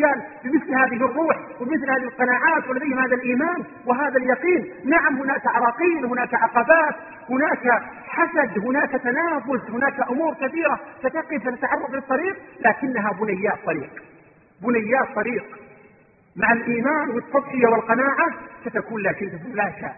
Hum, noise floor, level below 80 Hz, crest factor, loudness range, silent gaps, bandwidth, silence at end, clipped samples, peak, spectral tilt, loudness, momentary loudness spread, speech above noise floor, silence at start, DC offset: none; -53 dBFS; -62 dBFS; 20 dB; 4 LU; none; 3 kHz; 0 s; under 0.1%; -2 dBFS; -11.5 dB/octave; -21 LUFS; 8 LU; 32 dB; 0 s; under 0.1%